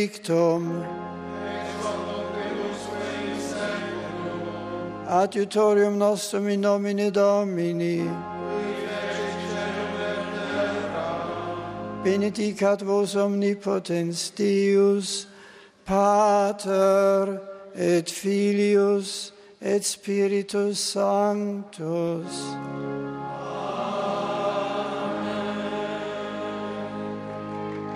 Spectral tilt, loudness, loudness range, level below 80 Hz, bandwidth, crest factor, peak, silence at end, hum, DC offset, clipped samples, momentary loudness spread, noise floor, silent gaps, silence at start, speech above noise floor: -5 dB/octave; -25 LUFS; 7 LU; -62 dBFS; 14 kHz; 16 dB; -8 dBFS; 0 s; none; under 0.1%; under 0.1%; 12 LU; -49 dBFS; none; 0 s; 26 dB